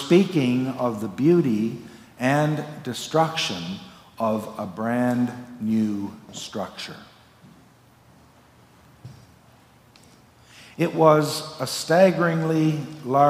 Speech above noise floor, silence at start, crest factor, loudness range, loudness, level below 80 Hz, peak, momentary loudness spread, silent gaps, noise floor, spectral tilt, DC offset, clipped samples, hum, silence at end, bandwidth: 32 dB; 0 s; 22 dB; 15 LU; -23 LUFS; -66 dBFS; -2 dBFS; 16 LU; none; -54 dBFS; -6 dB/octave; under 0.1%; under 0.1%; none; 0 s; 16 kHz